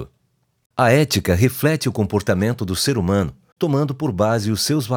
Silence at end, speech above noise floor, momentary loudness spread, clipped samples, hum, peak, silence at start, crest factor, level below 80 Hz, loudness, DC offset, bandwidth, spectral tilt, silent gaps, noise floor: 0 s; 48 dB; 6 LU; under 0.1%; none; -2 dBFS; 0 s; 16 dB; -44 dBFS; -19 LUFS; under 0.1%; over 20 kHz; -5.5 dB/octave; 0.66-0.70 s, 3.52-3.56 s; -66 dBFS